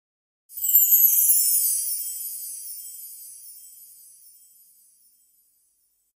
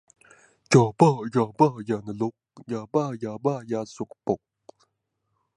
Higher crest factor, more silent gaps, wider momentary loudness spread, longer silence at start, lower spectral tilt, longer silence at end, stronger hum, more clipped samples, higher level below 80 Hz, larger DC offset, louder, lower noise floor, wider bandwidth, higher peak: about the same, 22 dB vs 22 dB; neither; first, 25 LU vs 12 LU; second, 0.5 s vs 0.7 s; second, 6 dB/octave vs -7 dB/octave; first, 2.3 s vs 1.2 s; neither; neither; second, -78 dBFS vs -66 dBFS; neither; first, -18 LUFS vs -25 LUFS; second, -68 dBFS vs -77 dBFS; first, 16 kHz vs 11 kHz; about the same, -4 dBFS vs -4 dBFS